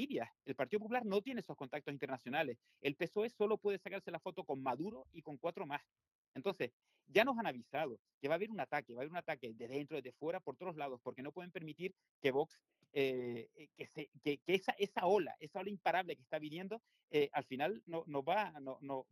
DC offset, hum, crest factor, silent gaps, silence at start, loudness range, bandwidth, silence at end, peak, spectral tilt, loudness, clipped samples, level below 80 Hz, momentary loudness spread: under 0.1%; none; 24 dB; 6.15-6.32 s, 6.73-6.80 s, 7.99-8.05 s, 8.14-8.21 s, 12.11-12.22 s, 14.08-14.12 s, 17.03-17.08 s; 0 s; 5 LU; 15 kHz; 0.1 s; -16 dBFS; -6 dB/octave; -41 LUFS; under 0.1%; -88 dBFS; 11 LU